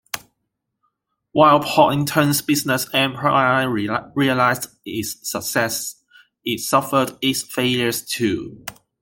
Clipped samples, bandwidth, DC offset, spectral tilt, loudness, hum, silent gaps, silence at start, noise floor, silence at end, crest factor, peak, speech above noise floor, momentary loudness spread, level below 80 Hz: under 0.1%; 17 kHz; under 0.1%; -4 dB/octave; -19 LUFS; none; none; 0.15 s; -77 dBFS; 0.3 s; 18 dB; -2 dBFS; 58 dB; 12 LU; -58 dBFS